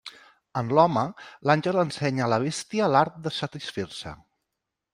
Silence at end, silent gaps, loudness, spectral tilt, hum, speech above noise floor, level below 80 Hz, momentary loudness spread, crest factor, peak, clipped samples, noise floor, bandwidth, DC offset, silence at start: 0.8 s; none; -25 LUFS; -5.5 dB/octave; none; 59 dB; -62 dBFS; 13 LU; 22 dB; -4 dBFS; under 0.1%; -84 dBFS; 15 kHz; under 0.1%; 0.05 s